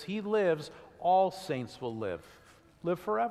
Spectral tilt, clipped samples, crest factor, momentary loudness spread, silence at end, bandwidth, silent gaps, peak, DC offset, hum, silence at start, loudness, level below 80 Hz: -6 dB/octave; under 0.1%; 16 dB; 12 LU; 0 s; 14.5 kHz; none; -16 dBFS; under 0.1%; none; 0 s; -32 LUFS; -70 dBFS